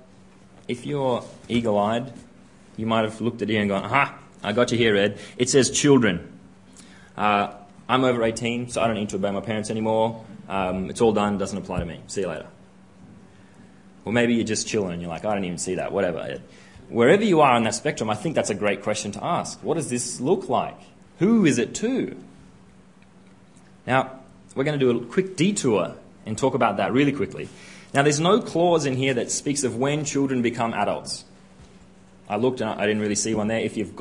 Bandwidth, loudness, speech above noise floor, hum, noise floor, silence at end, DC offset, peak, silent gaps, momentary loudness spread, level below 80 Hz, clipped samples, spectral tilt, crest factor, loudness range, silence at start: 11 kHz; -23 LUFS; 29 dB; none; -52 dBFS; 0 s; 0.1%; -2 dBFS; none; 13 LU; -54 dBFS; under 0.1%; -4.5 dB/octave; 22 dB; 5 LU; 0.7 s